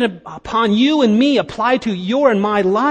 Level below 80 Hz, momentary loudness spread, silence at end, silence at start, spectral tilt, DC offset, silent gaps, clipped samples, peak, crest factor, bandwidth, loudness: -50 dBFS; 7 LU; 0 s; 0 s; -6 dB/octave; under 0.1%; none; under 0.1%; 0 dBFS; 14 dB; 9 kHz; -15 LUFS